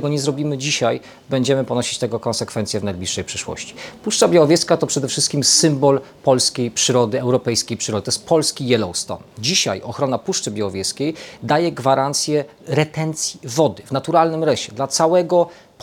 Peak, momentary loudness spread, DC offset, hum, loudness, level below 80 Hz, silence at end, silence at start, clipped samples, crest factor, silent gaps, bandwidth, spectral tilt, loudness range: 0 dBFS; 9 LU; under 0.1%; none; -18 LUFS; -60 dBFS; 0.3 s; 0 s; under 0.1%; 18 dB; none; 19 kHz; -4 dB/octave; 5 LU